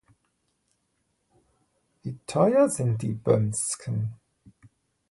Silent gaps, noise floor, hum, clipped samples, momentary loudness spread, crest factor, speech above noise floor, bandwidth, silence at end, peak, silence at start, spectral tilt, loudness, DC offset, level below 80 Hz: none; -74 dBFS; none; under 0.1%; 16 LU; 20 dB; 50 dB; 11.5 kHz; 0.95 s; -8 dBFS; 2.05 s; -6 dB/octave; -25 LUFS; under 0.1%; -60 dBFS